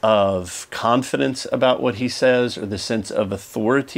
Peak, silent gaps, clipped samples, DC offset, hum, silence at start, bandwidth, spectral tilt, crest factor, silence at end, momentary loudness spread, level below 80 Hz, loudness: -2 dBFS; none; under 0.1%; under 0.1%; none; 0.05 s; 16 kHz; -4.5 dB/octave; 16 dB; 0 s; 7 LU; -56 dBFS; -21 LUFS